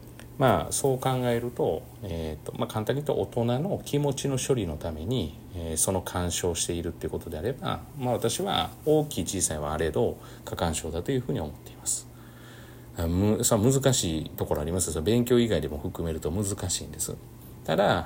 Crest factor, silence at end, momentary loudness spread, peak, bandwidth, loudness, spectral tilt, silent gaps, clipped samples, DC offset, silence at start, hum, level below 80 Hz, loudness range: 18 dB; 0 s; 12 LU; -8 dBFS; 16.5 kHz; -28 LUFS; -4.5 dB/octave; none; under 0.1%; under 0.1%; 0 s; none; -48 dBFS; 4 LU